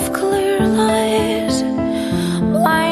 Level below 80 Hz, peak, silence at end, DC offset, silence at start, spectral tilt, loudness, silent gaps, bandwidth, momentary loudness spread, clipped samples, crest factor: -40 dBFS; -2 dBFS; 0 s; under 0.1%; 0 s; -5 dB/octave; -17 LUFS; none; 13 kHz; 4 LU; under 0.1%; 14 dB